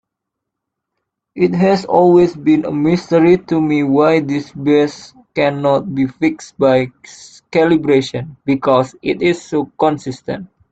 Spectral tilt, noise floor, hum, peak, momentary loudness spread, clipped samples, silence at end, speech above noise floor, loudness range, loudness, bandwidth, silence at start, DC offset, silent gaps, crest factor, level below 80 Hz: -7 dB/octave; -79 dBFS; none; 0 dBFS; 12 LU; under 0.1%; 0.25 s; 65 dB; 4 LU; -15 LUFS; 8.2 kHz; 1.35 s; under 0.1%; none; 14 dB; -52 dBFS